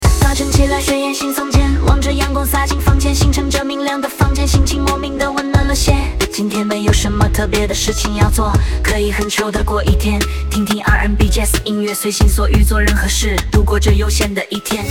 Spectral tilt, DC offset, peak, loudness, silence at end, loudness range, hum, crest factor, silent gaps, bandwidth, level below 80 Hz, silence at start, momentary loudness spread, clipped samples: -4.5 dB/octave; 0.2%; 0 dBFS; -15 LUFS; 0 s; 1 LU; none; 14 dB; none; 17 kHz; -16 dBFS; 0 s; 5 LU; under 0.1%